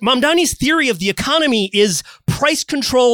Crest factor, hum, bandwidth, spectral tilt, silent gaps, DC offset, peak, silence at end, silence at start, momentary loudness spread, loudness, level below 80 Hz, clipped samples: 14 dB; none; 19.5 kHz; -3.5 dB/octave; none; under 0.1%; -2 dBFS; 0 s; 0 s; 4 LU; -15 LUFS; -42 dBFS; under 0.1%